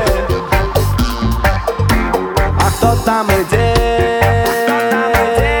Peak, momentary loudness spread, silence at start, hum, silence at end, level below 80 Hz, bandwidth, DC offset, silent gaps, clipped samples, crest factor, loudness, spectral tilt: 0 dBFS; 3 LU; 0 s; none; 0 s; -20 dBFS; over 20 kHz; under 0.1%; none; under 0.1%; 12 dB; -14 LUFS; -5.5 dB/octave